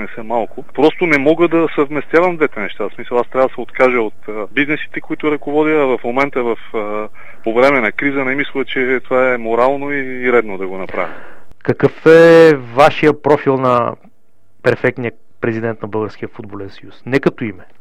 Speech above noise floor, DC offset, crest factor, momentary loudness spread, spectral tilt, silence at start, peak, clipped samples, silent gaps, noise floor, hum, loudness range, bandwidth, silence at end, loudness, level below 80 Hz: 41 dB; 6%; 16 dB; 14 LU; -7 dB/octave; 0 s; 0 dBFS; 0.1%; none; -55 dBFS; none; 7 LU; 10 kHz; 0 s; -15 LUFS; -50 dBFS